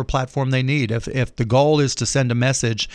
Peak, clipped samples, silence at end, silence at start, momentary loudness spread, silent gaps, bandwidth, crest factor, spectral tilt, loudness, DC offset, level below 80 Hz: -6 dBFS; under 0.1%; 0 s; 0 s; 6 LU; none; 10.5 kHz; 14 dB; -5 dB/octave; -19 LUFS; under 0.1%; -38 dBFS